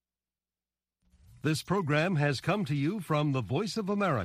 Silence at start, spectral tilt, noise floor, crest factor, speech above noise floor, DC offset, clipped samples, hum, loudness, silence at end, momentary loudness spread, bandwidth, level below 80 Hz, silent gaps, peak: 1.45 s; -6.5 dB/octave; under -90 dBFS; 16 dB; over 61 dB; under 0.1%; under 0.1%; none; -30 LUFS; 0 s; 4 LU; 14.5 kHz; -64 dBFS; none; -14 dBFS